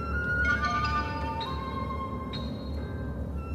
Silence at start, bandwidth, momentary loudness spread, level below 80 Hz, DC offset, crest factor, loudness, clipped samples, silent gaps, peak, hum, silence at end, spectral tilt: 0 s; 11.5 kHz; 10 LU; -38 dBFS; under 0.1%; 16 dB; -31 LUFS; under 0.1%; none; -16 dBFS; none; 0 s; -6 dB/octave